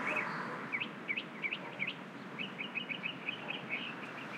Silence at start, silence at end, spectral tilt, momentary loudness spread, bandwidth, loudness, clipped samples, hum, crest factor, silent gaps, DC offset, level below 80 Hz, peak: 0 s; 0 s; -4.5 dB/octave; 5 LU; 16 kHz; -39 LUFS; under 0.1%; none; 16 dB; none; under 0.1%; under -90 dBFS; -24 dBFS